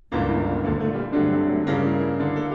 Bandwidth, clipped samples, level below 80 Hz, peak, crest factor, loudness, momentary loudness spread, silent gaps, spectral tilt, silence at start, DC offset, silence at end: 6.2 kHz; under 0.1%; -42 dBFS; -10 dBFS; 12 dB; -23 LUFS; 3 LU; none; -9.5 dB/octave; 0.1 s; under 0.1%; 0 s